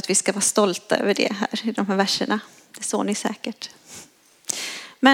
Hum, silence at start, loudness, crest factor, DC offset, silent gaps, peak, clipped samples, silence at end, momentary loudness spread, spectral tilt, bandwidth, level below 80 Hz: none; 0.05 s; -23 LUFS; 22 dB; under 0.1%; none; -2 dBFS; under 0.1%; 0 s; 18 LU; -2.5 dB/octave; 17 kHz; -74 dBFS